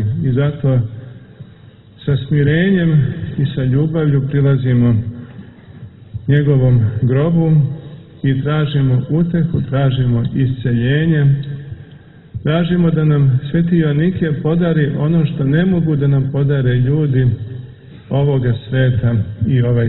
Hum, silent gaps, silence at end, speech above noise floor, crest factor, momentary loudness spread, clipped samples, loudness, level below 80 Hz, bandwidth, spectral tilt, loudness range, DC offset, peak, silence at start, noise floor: none; none; 0 s; 28 dB; 12 dB; 12 LU; under 0.1%; -15 LUFS; -38 dBFS; 4.1 kHz; -12.5 dB/octave; 2 LU; under 0.1%; -2 dBFS; 0 s; -41 dBFS